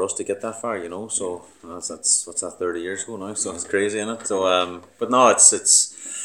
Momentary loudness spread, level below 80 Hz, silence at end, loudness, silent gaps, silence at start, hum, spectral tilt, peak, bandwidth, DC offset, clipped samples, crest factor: 17 LU; -66 dBFS; 0 s; -19 LUFS; none; 0 s; none; -1 dB/octave; 0 dBFS; 18.5 kHz; under 0.1%; under 0.1%; 22 dB